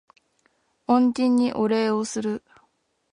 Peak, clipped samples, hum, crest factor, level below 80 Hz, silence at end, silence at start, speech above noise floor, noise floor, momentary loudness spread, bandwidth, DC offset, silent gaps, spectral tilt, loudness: -6 dBFS; under 0.1%; none; 18 dB; -66 dBFS; 0.75 s; 0.9 s; 47 dB; -68 dBFS; 11 LU; 10.5 kHz; under 0.1%; none; -5 dB/octave; -22 LUFS